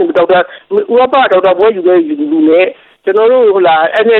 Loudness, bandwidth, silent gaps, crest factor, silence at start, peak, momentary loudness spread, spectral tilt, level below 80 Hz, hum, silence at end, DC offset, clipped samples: -9 LUFS; 4.4 kHz; none; 8 dB; 0 s; 0 dBFS; 7 LU; -7 dB/octave; -54 dBFS; none; 0 s; under 0.1%; under 0.1%